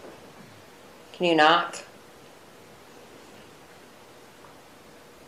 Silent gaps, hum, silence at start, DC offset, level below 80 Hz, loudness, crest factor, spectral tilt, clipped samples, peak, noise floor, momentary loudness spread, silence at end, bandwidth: none; none; 0.05 s; under 0.1%; -72 dBFS; -21 LUFS; 24 dB; -3.5 dB/octave; under 0.1%; -6 dBFS; -50 dBFS; 30 LU; 3.45 s; 15.5 kHz